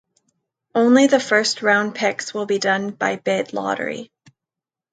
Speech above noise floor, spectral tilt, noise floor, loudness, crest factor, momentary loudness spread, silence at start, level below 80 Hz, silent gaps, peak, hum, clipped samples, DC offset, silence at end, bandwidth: 69 dB; -3.5 dB/octave; -88 dBFS; -19 LUFS; 18 dB; 11 LU; 0.75 s; -72 dBFS; none; -2 dBFS; none; under 0.1%; under 0.1%; 0.85 s; 9.2 kHz